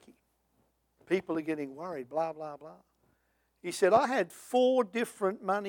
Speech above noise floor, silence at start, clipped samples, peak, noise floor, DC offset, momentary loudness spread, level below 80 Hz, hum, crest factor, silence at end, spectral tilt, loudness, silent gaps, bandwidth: 44 dB; 1.1 s; under 0.1%; -12 dBFS; -75 dBFS; under 0.1%; 15 LU; -76 dBFS; none; 20 dB; 0 s; -4.5 dB/octave; -31 LUFS; none; 18 kHz